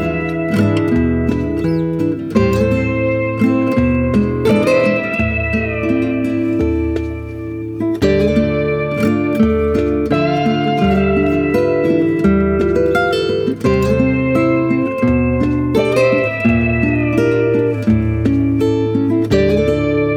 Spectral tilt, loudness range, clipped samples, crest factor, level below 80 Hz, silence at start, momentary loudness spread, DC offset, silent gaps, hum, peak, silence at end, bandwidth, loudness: -8 dB/octave; 2 LU; under 0.1%; 14 dB; -30 dBFS; 0 s; 4 LU; under 0.1%; none; none; -2 dBFS; 0 s; 15.5 kHz; -15 LUFS